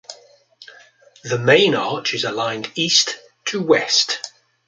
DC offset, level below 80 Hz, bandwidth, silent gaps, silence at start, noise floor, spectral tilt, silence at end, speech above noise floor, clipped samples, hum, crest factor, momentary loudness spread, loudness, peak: under 0.1%; -66 dBFS; 9.4 kHz; none; 0.1 s; -49 dBFS; -2.5 dB/octave; 0.4 s; 31 dB; under 0.1%; none; 18 dB; 13 LU; -18 LUFS; -2 dBFS